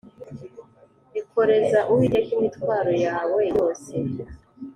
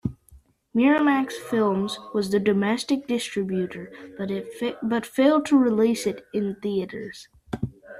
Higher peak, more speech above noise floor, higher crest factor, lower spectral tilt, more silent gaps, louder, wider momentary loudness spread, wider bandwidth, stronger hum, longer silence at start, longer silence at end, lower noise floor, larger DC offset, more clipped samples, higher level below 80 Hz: about the same, -8 dBFS vs -6 dBFS; about the same, 34 dB vs 31 dB; about the same, 16 dB vs 18 dB; first, -7 dB/octave vs -5.5 dB/octave; neither; about the same, -22 LUFS vs -24 LUFS; first, 21 LU vs 15 LU; second, 10.5 kHz vs 14 kHz; neither; first, 0.2 s vs 0.05 s; about the same, 0.05 s vs 0 s; about the same, -55 dBFS vs -54 dBFS; neither; neither; about the same, -54 dBFS vs -56 dBFS